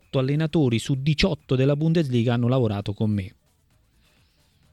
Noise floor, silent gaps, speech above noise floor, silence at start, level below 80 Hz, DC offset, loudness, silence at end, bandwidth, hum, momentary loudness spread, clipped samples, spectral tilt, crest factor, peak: -63 dBFS; none; 41 dB; 0.15 s; -46 dBFS; under 0.1%; -23 LUFS; 1.45 s; 12 kHz; none; 5 LU; under 0.1%; -7 dB/octave; 16 dB; -8 dBFS